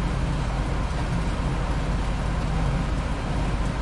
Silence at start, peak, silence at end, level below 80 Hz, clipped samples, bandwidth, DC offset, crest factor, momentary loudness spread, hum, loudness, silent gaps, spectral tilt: 0 s; -12 dBFS; 0 s; -28 dBFS; under 0.1%; 11.5 kHz; under 0.1%; 12 dB; 2 LU; none; -27 LUFS; none; -6.5 dB/octave